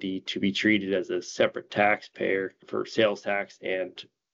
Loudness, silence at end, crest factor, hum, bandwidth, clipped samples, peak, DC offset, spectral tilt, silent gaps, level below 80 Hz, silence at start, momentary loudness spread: -27 LUFS; 0.3 s; 20 dB; none; 7.8 kHz; under 0.1%; -8 dBFS; under 0.1%; -4.5 dB/octave; none; -72 dBFS; 0 s; 9 LU